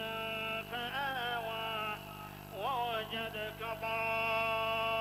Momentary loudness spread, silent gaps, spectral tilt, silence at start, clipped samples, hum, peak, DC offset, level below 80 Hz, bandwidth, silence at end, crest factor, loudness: 8 LU; none; -4 dB/octave; 0 s; under 0.1%; 50 Hz at -50 dBFS; -22 dBFS; under 0.1%; -62 dBFS; 16 kHz; 0 s; 14 dB; -36 LUFS